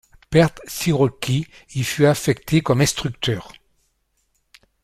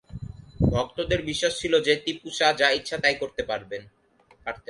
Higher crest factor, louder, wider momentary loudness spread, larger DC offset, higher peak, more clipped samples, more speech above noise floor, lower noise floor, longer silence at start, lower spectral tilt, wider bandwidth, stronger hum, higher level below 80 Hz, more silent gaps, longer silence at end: about the same, 20 dB vs 22 dB; first, -20 LUFS vs -24 LUFS; second, 8 LU vs 16 LU; neither; first, -2 dBFS vs -6 dBFS; neither; first, 49 dB vs 31 dB; first, -68 dBFS vs -56 dBFS; first, 0.3 s vs 0.1 s; about the same, -5 dB/octave vs -4 dB/octave; first, 15.5 kHz vs 11.5 kHz; neither; second, -48 dBFS vs -42 dBFS; neither; first, 1.35 s vs 0.1 s